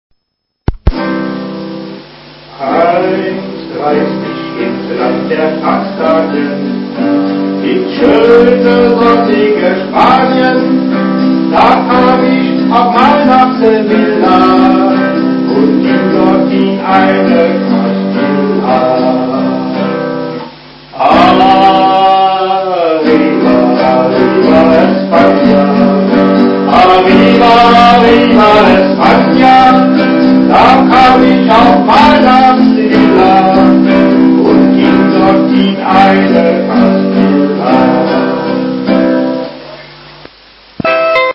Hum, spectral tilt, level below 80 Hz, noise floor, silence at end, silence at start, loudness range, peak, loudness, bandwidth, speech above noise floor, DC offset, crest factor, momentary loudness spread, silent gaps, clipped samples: none; -7.5 dB/octave; -34 dBFS; -68 dBFS; 0 s; 0.7 s; 8 LU; 0 dBFS; -7 LUFS; 8 kHz; 61 dB; under 0.1%; 8 dB; 10 LU; none; 2%